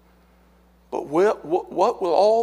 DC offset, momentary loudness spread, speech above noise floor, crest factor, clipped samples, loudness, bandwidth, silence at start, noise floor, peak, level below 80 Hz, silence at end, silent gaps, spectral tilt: under 0.1%; 11 LU; 36 dB; 16 dB; under 0.1%; -22 LUFS; 12 kHz; 0.9 s; -56 dBFS; -6 dBFS; -58 dBFS; 0 s; none; -5.5 dB/octave